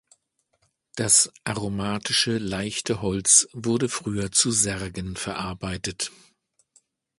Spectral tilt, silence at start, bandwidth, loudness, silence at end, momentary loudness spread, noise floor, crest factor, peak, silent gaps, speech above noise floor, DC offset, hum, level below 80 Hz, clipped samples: -2.5 dB/octave; 0.95 s; 12 kHz; -23 LUFS; 1.1 s; 14 LU; -71 dBFS; 24 dB; -2 dBFS; none; 46 dB; under 0.1%; none; -50 dBFS; under 0.1%